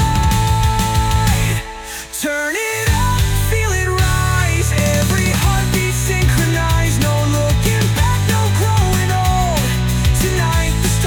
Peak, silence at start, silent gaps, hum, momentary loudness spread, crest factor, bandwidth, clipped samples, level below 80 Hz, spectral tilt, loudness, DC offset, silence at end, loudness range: -4 dBFS; 0 s; none; none; 3 LU; 12 dB; 19.5 kHz; under 0.1%; -22 dBFS; -4.5 dB/octave; -16 LUFS; under 0.1%; 0 s; 2 LU